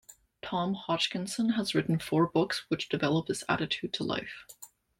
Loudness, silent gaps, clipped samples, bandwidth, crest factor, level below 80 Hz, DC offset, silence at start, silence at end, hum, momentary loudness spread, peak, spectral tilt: -30 LUFS; none; under 0.1%; 16.5 kHz; 18 dB; -64 dBFS; under 0.1%; 0.1 s; 0.35 s; none; 13 LU; -12 dBFS; -5 dB/octave